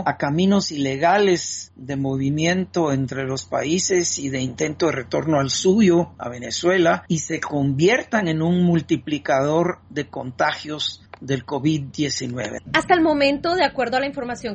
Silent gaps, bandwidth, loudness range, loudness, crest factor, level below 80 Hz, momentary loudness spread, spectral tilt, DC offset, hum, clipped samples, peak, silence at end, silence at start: none; 8.2 kHz; 4 LU; -21 LUFS; 16 dB; -54 dBFS; 10 LU; -4.5 dB/octave; under 0.1%; none; under 0.1%; -4 dBFS; 0 s; 0 s